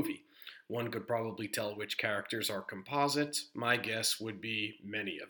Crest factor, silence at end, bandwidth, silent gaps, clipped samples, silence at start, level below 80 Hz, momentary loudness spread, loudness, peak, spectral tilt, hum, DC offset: 22 dB; 0 s; over 20 kHz; none; under 0.1%; 0 s; -82 dBFS; 8 LU; -35 LUFS; -16 dBFS; -3 dB/octave; none; under 0.1%